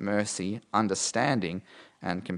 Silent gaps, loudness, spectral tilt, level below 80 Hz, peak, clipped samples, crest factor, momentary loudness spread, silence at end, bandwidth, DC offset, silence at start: none; -29 LUFS; -4 dB/octave; -70 dBFS; -10 dBFS; under 0.1%; 20 dB; 10 LU; 0 s; 11 kHz; under 0.1%; 0 s